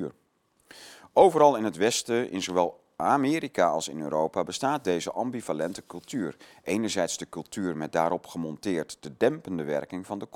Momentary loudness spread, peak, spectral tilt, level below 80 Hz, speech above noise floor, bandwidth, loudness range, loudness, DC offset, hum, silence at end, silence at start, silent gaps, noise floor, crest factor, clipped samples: 14 LU; -6 dBFS; -4.5 dB/octave; -68 dBFS; 42 dB; 17 kHz; 6 LU; -27 LUFS; under 0.1%; none; 0.1 s; 0 s; none; -69 dBFS; 22 dB; under 0.1%